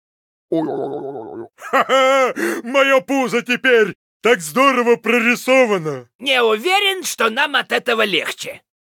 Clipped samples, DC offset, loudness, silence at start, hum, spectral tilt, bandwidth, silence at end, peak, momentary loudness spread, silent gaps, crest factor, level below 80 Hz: under 0.1%; under 0.1%; -16 LUFS; 0.5 s; none; -3 dB/octave; 19 kHz; 0.4 s; -2 dBFS; 12 LU; 3.95-4.20 s, 6.15-6.19 s; 16 dB; -70 dBFS